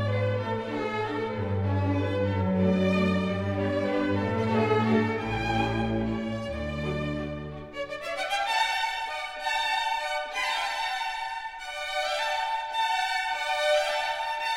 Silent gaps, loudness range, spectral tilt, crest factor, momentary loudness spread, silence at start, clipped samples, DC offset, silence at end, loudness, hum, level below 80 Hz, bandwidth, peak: none; 4 LU; -5.5 dB/octave; 16 dB; 8 LU; 0 s; under 0.1%; 0.1%; 0 s; -28 LUFS; none; -48 dBFS; 16 kHz; -12 dBFS